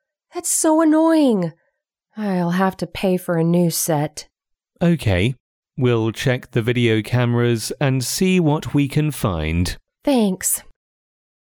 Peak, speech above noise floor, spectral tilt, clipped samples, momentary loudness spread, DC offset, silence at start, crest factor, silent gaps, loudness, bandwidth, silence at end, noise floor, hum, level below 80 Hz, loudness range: -6 dBFS; 54 dB; -5.5 dB/octave; under 0.1%; 9 LU; under 0.1%; 0.35 s; 14 dB; 5.40-5.63 s; -19 LUFS; 19.5 kHz; 0.95 s; -72 dBFS; none; -42 dBFS; 2 LU